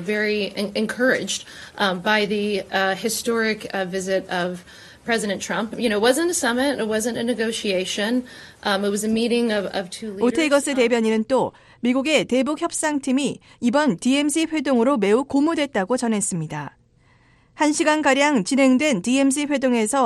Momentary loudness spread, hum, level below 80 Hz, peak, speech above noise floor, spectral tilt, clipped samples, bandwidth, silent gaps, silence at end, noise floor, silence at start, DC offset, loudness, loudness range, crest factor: 8 LU; none; -58 dBFS; -4 dBFS; 36 dB; -3.5 dB/octave; under 0.1%; 12.5 kHz; none; 0 s; -57 dBFS; 0 s; under 0.1%; -21 LUFS; 2 LU; 18 dB